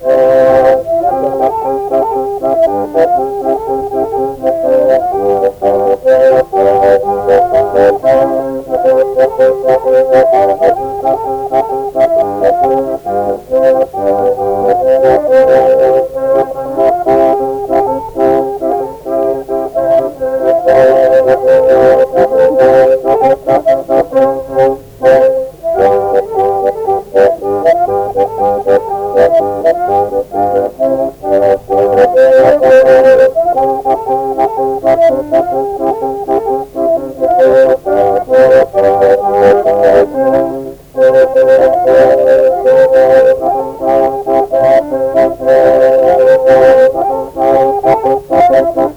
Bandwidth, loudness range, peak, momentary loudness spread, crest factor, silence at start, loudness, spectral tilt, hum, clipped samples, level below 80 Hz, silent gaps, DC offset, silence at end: 19 kHz; 4 LU; 0 dBFS; 8 LU; 8 dB; 0 s; -9 LUFS; -6.5 dB/octave; none; under 0.1%; -40 dBFS; none; under 0.1%; 0 s